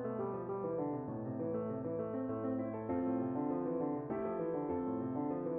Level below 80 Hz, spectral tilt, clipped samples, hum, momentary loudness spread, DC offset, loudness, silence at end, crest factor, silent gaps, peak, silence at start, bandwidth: -68 dBFS; -10.5 dB/octave; under 0.1%; none; 3 LU; under 0.1%; -39 LUFS; 0 s; 12 dB; none; -26 dBFS; 0 s; 3.3 kHz